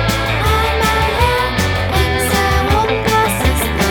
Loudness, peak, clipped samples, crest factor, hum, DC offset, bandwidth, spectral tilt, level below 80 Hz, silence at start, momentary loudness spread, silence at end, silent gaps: -14 LUFS; 0 dBFS; under 0.1%; 14 dB; none; under 0.1%; over 20 kHz; -4.5 dB/octave; -22 dBFS; 0 s; 2 LU; 0 s; none